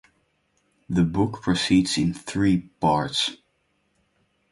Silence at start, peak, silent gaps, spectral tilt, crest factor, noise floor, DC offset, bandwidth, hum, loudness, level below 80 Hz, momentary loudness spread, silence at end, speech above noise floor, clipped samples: 0.9 s; -6 dBFS; none; -5 dB/octave; 18 dB; -70 dBFS; under 0.1%; 11.5 kHz; none; -23 LUFS; -48 dBFS; 5 LU; 1.15 s; 47 dB; under 0.1%